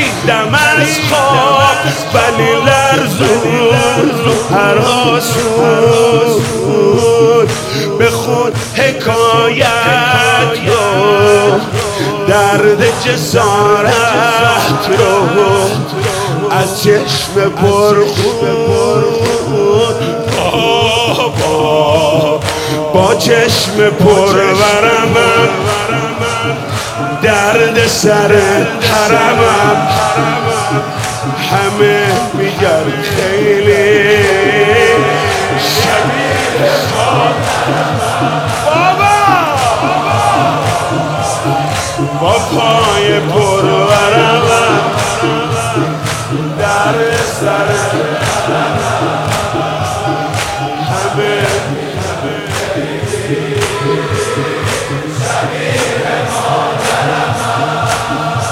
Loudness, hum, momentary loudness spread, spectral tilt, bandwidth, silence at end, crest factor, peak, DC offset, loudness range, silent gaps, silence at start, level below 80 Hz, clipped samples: -11 LUFS; none; 7 LU; -4.5 dB/octave; 16.5 kHz; 0 s; 10 dB; 0 dBFS; under 0.1%; 5 LU; none; 0 s; -42 dBFS; 0.4%